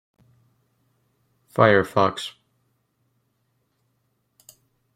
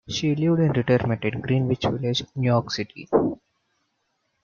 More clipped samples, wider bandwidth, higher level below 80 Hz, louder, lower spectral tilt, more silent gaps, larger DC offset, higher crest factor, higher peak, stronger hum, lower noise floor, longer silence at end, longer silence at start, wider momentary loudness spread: neither; first, 15.5 kHz vs 7.2 kHz; second, -64 dBFS vs -54 dBFS; first, -20 LUFS vs -23 LUFS; about the same, -6 dB/octave vs -6.5 dB/octave; neither; neither; first, 24 dB vs 18 dB; first, -2 dBFS vs -6 dBFS; neither; about the same, -71 dBFS vs -73 dBFS; first, 2.65 s vs 1.1 s; first, 1.55 s vs 0.1 s; first, 16 LU vs 7 LU